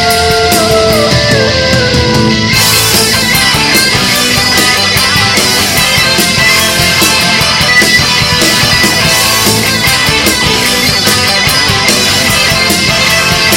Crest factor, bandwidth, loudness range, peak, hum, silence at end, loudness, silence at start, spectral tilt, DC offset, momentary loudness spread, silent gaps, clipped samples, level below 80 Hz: 8 dB; over 20 kHz; 1 LU; 0 dBFS; none; 0 s; -6 LUFS; 0 s; -2.5 dB/octave; under 0.1%; 2 LU; none; 0.7%; -28 dBFS